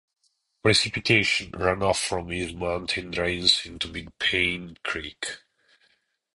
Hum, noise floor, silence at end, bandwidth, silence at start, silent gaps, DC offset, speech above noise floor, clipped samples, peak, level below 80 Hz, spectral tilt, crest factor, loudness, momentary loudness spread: none; -72 dBFS; 1 s; 11.5 kHz; 0.65 s; none; under 0.1%; 46 dB; under 0.1%; -4 dBFS; -48 dBFS; -3 dB/octave; 22 dB; -24 LUFS; 12 LU